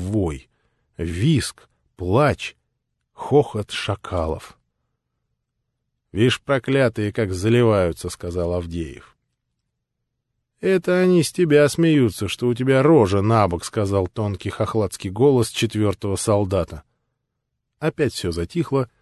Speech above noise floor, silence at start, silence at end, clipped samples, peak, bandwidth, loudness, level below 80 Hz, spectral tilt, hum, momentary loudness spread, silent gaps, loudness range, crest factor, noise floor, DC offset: 58 dB; 0 s; 0.15 s; under 0.1%; -2 dBFS; 12.5 kHz; -20 LUFS; -40 dBFS; -6 dB/octave; none; 13 LU; none; 8 LU; 18 dB; -78 dBFS; under 0.1%